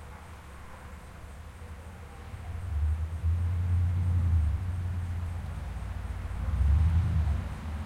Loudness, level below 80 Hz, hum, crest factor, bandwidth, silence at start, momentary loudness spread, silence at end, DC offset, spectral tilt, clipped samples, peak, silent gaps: -31 LUFS; -36 dBFS; none; 14 dB; 9.6 kHz; 0 s; 19 LU; 0 s; under 0.1%; -7.5 dB/octave; under 0.1%; -16 dBFS; none